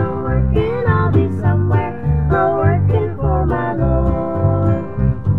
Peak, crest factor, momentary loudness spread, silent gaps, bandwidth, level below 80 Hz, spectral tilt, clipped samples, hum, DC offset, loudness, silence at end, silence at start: -2 dBFS; 14 dB; 4 LU; none; 4.2 kHz; -24 dBFS; -11 dB/octave; under 0.1%; none; 2%; -17 LUFS; 0 s; 0 s